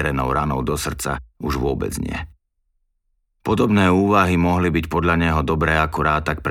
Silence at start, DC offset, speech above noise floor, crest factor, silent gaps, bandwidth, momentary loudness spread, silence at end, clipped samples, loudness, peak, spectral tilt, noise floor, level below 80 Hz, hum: 0 s; under 0.1%; 50 dB; 18 dB; none; 17 kHz; 11 LU; 0 s; under 0.1%; -19 LUFS; -2 dBFS; -6 dB/octave; -69 dBFS; -32 dBFS; none